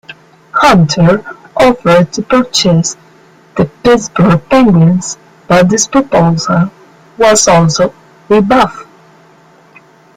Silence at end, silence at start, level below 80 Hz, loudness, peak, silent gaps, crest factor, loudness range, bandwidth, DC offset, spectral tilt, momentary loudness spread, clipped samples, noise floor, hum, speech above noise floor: 1.35 s; 0.1 s; -38 dBFS; -9 LUFS; 0 dBFS; none; 10 dB; 2 LU; 15 kHz; under 0.1%; -5 dB/octave; 9 LU; under 0.1%; -43 dBFS; none; 34 dB